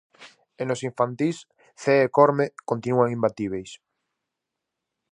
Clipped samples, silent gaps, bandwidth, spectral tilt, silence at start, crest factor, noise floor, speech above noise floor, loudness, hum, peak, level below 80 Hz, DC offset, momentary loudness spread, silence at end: under 0.1%; none; 10.5 kHz; -6.5 dB/octave; 0.2 s; 22 dB; -84 dBFS; 61 dB; -23 LUFS; none; -4 dBFS; -66 dBFS; under 0.1%; 14 LU; 1.35 s